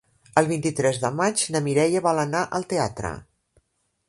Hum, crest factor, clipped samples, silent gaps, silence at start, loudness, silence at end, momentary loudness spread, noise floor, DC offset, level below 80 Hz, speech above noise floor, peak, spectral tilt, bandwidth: none; 24 dB; under 0.1%; none; 0.35 s; -23 LUFS; 0.85 s; 7 LU; -68 dBFS; under 0.1%; -54 dBFS; 45 dB; 0 dBFS; -4.5 dB/octave; 11.5 kHz